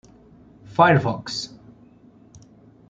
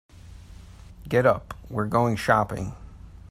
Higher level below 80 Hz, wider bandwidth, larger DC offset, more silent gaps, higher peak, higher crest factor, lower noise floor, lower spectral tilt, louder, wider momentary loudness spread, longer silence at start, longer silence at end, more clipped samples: second, -58 dBFS vs -46 dBFS; second, 9 kHz vs 15.5 kHz; neither; neither; first, -2 dBFS vs -6 dBFS; about the same, 22 dB vs 20 dB; first, -51 dBFS vs -45 dBFS; about the same, -6 dB/octave vs -6.5 dB/octave; first, -20 LUFS vs -24 LUFS; about the same, 14 LU vs 15 LU; first, 0.7 s vs 0.25 s; first, 1.45 s vs 0.05 s; neither